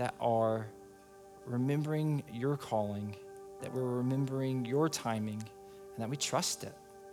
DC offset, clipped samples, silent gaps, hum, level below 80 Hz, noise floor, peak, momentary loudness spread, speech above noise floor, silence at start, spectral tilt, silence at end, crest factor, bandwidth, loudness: under 0.1%; under 0.1%; none; none; -72 dBFS; -55 dBFS; -18 dBFS; 17 LU; 21 dB; 0 s; -5.5 dB/octave; 0 s; 18 dB; 18 kHz; -35 LUFS